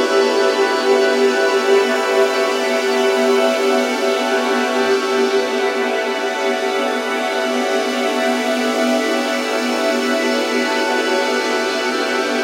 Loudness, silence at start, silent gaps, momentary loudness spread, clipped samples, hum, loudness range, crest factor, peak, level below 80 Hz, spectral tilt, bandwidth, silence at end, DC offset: -17 LUFS; 0 s; none; 4 LU; under 0.1%; none; 3 LU; 14 dB; -2 dBFS; -72 dBFS; -1.5 dB/octave; 16 kHz; 0 s; under 0.1%